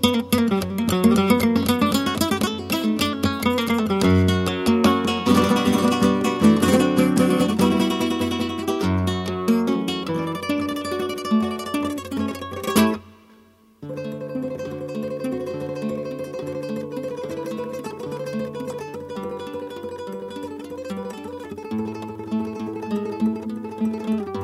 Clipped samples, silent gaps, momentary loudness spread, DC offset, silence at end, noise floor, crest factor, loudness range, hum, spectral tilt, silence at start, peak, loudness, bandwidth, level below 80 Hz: under 0.1%; none; 14 LU; under 0.1%; 0 s; -53 dBFS; 20 dB; 12 LU; none; -5.5 dB/octave; 0 s; -2 dBFS; -22 LUFS; 16 kHz; -52 dBFS